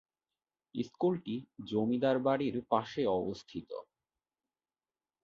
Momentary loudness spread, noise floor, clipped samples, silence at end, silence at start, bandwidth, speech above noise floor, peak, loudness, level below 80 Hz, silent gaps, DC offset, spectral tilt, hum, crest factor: 14 LU; under -90 dBFS; under 0.1%; 1.4 s; 0.75 s; 7.4 kHz; over 57 dB; -14 dBFS; -34 LUFS; -70 dBFS; none; under 0.1%; -7.5 dB/octave; none; 20 dB